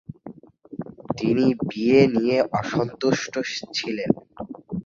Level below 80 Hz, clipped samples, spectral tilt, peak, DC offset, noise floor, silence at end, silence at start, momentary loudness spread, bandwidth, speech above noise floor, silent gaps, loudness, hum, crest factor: -56 dBFS; under 0.1%; -6 dB/octave; -4 dBFS; under 0.1%; -44 dBFS; 0.05 s; 0.1 s; 20 LU; 7.6 kHz; 22 dB; none; -22 LUFS; none; 20 dB